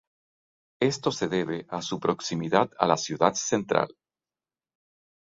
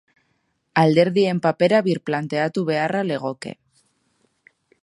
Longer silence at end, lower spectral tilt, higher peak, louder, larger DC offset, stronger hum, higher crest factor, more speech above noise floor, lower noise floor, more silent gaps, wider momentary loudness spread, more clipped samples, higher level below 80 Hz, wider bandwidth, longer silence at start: first, 1.45 s vs 1.3 s; second, -4.5 dB/octave vs -7 dB/octave; about the same, -4 dBFS vs -2 dBFS; second, -27 LUFS vs -20 LUFS; neither; neither; about the same, 24 dB vs 20 dB; first, over 64 dB vs 50 dB; first, under -90 dBFS vs -69 dBFS; neither; second, 7 LU vs 10 LU; neither; about the same, -66 dBFS vs -68 dBFS; second, 7.8 kHz vs 11.5 kHz; about the same, 0.8 s vs 0.75 s